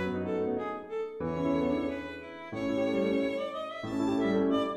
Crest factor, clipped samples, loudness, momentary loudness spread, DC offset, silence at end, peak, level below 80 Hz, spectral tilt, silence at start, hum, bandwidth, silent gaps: 14 dB; under 0.1%; -32 LUFS; 9 LU; under 0.1%; 0 s; -18 dBFS; -58 dBFS; -7 dB/octave; 0 s; none; 9.4 kHz; none